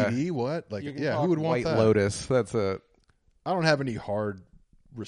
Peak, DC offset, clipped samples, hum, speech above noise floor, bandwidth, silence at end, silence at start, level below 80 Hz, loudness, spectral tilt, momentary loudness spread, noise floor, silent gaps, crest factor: -10 dBFS; under 0.1%; under 0.1%; none; 39 dB; 11.5 kHz; 0 s; 0 s; -58 dBFS; -27 LUFS; -6 dB/octave; 13 LU; -65 dBFS; none; 18 dB